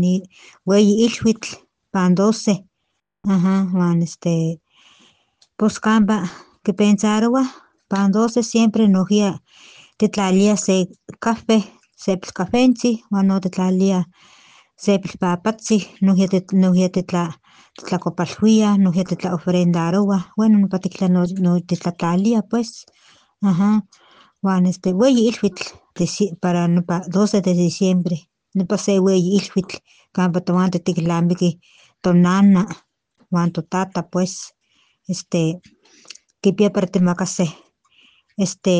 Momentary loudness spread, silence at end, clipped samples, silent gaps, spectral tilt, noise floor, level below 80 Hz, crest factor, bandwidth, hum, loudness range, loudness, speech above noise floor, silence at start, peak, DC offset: 10 LU; 0 s; under 0.1%; none; -6.5 dB/octave; -74 dBFS; -58 dBFS; 16 dB; 9.6 kHz; none; 4 LU; -18 LUFS; 57 dB; 0 s; -2 dBFS; under 0.1%